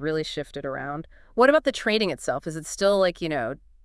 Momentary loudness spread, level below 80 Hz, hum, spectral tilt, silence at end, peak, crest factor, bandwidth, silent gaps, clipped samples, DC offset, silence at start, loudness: 14 LU; -52 dBFS; none; -4 dB/octave; 0.3 s; -4 dBFS; 20 dB; 12 kHz; none; under 0.1%; under 0.1%; 0 s; -25 LUFS